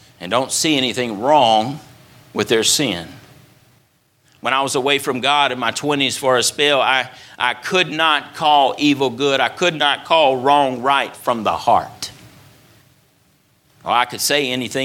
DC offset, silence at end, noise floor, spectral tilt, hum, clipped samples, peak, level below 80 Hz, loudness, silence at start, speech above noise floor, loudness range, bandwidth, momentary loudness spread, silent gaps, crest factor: under 0.1%; 0 s; -59 dBFS; -2.5 dB/octave; none; under 0.1%; 0 dBFS; -60 dBFS; -17 LUFS; 0.2 s; 42 dB; 5 LU; 18 kHz; 8 LU; none; 18 dB